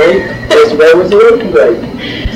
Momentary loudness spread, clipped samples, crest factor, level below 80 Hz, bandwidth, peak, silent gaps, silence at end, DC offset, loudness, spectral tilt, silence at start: 11 LU; 0.5%; 8 dB; -28 dBFS; 11.5 kHz; 0 dBFS; none; 0 s; under 0.1%; -7 LUFS; -5.5 dB/octave; 0 s